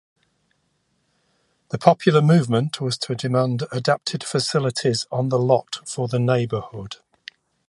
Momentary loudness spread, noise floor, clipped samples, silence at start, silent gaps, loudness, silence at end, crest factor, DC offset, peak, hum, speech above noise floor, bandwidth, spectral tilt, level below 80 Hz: 18 LU; -69 dBFS; under 0.1%; 1.75 s; none; -21 LUFS; 0.75 s; 22 dB; under 0.1%; 0 dBFS; none; 48 dB; 11.5 kHz; -6 dB/octave; -60 dBFS